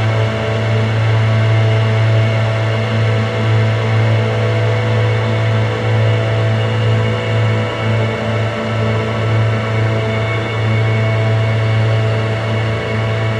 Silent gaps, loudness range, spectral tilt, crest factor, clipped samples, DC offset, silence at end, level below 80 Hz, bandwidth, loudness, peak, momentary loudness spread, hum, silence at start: none; 2 LU; -7 dB/octave; 10 dB; under 0.1%; under 0.1%; 0 s; -40 dBFS; 7.8 kHz; -15 LUFS; -4 dBFS; 4 LU; none; 0 s